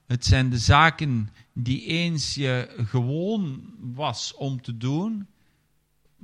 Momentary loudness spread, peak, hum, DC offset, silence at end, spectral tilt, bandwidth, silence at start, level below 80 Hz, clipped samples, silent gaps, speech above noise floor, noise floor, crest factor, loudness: 14 LU; -2 dBFS; none; under 0.1%; 1 s; -5 dB/octave; 10.5 kHz; 0.1 s; -42 dBFS; under 0.1%; none; 43 dB; -67 dBFS; 22 dB; -24 LUFS